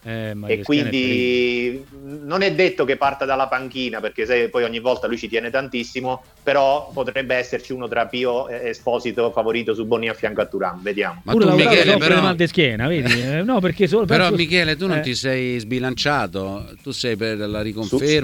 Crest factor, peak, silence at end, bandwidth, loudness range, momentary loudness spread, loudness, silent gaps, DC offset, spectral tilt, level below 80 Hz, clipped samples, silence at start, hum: 20 dB; 0 dBFS; 0 s; 17 kHz; 6 LU; 10 LU; -19 LUFS; none; under 0.1%; -5.5 dB/octave; -48 dBFS; under 0.1%; 0.05 s; none